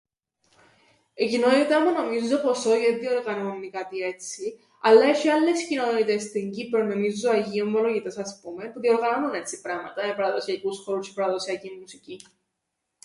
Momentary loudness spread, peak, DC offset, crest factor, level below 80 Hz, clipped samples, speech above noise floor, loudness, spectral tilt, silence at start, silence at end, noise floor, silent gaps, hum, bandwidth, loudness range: 14 LU; -4 dBFS; under 0.1%; 20 dB; -74 dBFS; under 0.1%; 57 dB; -24 LUFS; -4 dB/octave; 1.2 s; 0.85 s; -81 dBFS; none; none; 11.5 kHz; 6 LU